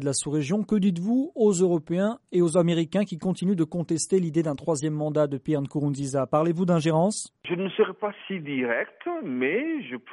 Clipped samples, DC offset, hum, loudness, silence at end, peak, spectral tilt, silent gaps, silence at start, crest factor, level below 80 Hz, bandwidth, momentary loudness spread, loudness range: under 0.1%; under 0.1%; none; -25 LUFS; 0 s; -10 dBFS; -6 dB/octave; none; 0 s; 16 dB; -64 dBFS; 11.5 kHz; 8 LU; 2 LU